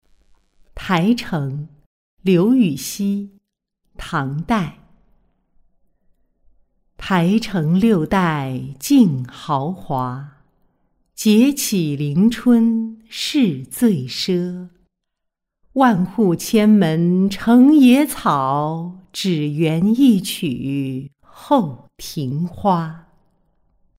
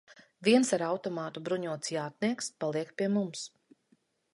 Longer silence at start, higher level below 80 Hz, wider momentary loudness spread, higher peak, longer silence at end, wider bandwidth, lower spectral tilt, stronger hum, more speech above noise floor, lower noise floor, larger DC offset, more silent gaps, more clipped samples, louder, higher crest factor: first, 0.75 s vs 0.1 s; first, -48 dBFS vs -80 dBFS; about the same, 13 LU vs 12 LU; first, -2 dBFS vs -12 dBFS; first, 1 s vs 0.85 s; first, 16 kHz vs 11.5 kHz; first, -6 dB/octave vs -4.5 dB/octave; neither; first, 61 dB vs 40 dB; first, -78 dBFS vs -71 dBFS; neither; first, 1.86-2.17 s vs none; neither; first, -18 LUFS vs -31 LUFS; about the same, 16 dB vs 20 dB